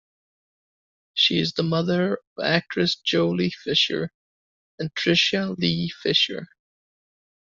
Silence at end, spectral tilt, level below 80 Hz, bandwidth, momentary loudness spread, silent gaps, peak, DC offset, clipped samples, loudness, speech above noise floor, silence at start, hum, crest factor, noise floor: 1.05 s; -5 dB/octave; -62 dBFS; 7.6 kHz; 10 LU; 2.27-2.36 s, 4.14-4.78 s; -2 dBFS; under 0.1%; under 0.1%; -22 LUFS; over 67 dB; 1.15 s; none; 22 dB; under -90 dBFS